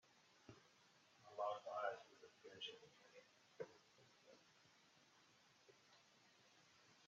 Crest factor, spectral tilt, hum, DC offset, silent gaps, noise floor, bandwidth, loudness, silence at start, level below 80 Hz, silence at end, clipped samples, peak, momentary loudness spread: 26 dB; -0.5 dB/octave; none; under 0.1%; none; -74 dBFS; 7.4 kHz; -52 LUFS; 0.05 s; under -90 dBFS; 0 s; under 0.1%; -32 dBFS; 21 LU